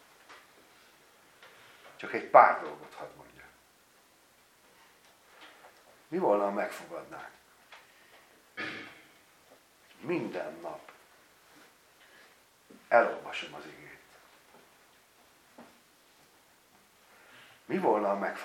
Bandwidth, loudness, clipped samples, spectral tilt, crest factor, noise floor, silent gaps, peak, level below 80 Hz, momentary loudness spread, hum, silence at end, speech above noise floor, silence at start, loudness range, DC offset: 17 kHz; -29 LUFS; under 0.1%; -5.5 dB/octave; 30 dB; -63 dBFS; none; -4 dBFS; -80 dBFS; 29 LU; none; 0 s; 34 dB; 0.3 s; 16 LU; under 0.1%